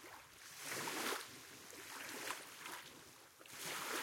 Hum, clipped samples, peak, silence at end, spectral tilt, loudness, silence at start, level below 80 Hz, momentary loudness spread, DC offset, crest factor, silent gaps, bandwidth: none; under 0.1%; -28 dBFS; 0 s; -1 dB/octave; -47 LUFS; 0 s; -86 dBFS; 14 LU; under 0.1%; 22 dB; none; 16.5 kHz